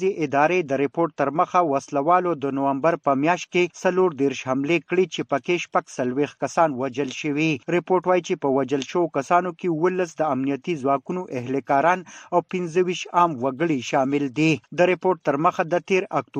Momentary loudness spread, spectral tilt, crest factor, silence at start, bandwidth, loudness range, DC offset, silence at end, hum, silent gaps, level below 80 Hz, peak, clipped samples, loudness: 5 LU; -6 dB/octave; 18 dB; 0 s; 9.2 kHz; 2 LU; under 0.1%; 0 s; none; none; -68 dBFS; -4 dBFS; under 0.1%; -22 LUFS